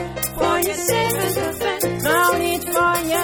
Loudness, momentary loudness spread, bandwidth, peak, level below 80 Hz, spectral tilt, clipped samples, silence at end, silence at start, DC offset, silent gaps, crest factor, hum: -19 LUFS; 5 LU; over 20 kHz; -6 dBFS; -44 dBFS; -3.5 dB/octave; under 0.1%; 0 s; 0 s; under 0.1%; none; 14 dB; none